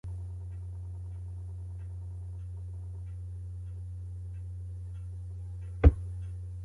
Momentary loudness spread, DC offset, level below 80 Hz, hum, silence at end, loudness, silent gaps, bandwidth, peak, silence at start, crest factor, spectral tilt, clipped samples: 15 LU; under 0.1%; -36 dBFS; none; 0 s; -36 LUFS; none; 3.6 kHz; -6 dBFS; 0.05 s; 28 dB; -9.5 dB/octave; under 0.1%